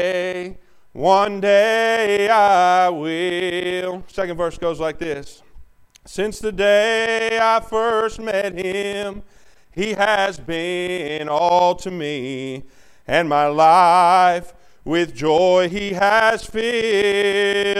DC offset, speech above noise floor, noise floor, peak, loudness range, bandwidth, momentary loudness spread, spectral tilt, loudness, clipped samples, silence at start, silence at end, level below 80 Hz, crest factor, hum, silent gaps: under 0.1%; 27 dB; -45 dBFS; -2 dBFS; 6 LU; 14 kHz; 12 LU; -4 dB/octave; -18 LUFS; under 0.1%; 0 s; 0 s; -46 dBFS; 16 dB; none; none